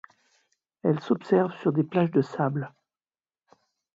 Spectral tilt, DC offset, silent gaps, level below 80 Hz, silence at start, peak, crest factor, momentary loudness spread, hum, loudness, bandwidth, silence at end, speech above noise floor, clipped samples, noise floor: -9 dB/octave; under 0.1%; none; -74 dBFS; 0.85 s; -8 dBFS; 18 dB; 7 LU; none; -26 LUFS; 7.6 kHz; 1.25 s; over 65 dB; under 0.1%; under -90 dBFS